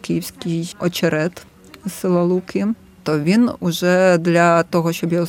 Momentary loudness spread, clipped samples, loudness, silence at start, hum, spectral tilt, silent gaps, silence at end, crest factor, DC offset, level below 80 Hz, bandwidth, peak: 10 LU; under 0.1%; -18 LUFS; 0.05 s; none; -6 dB/octave; none; 0 s; 16 dB; under 0.1%; -56 dBFS; 17 kHz; 0 dBFS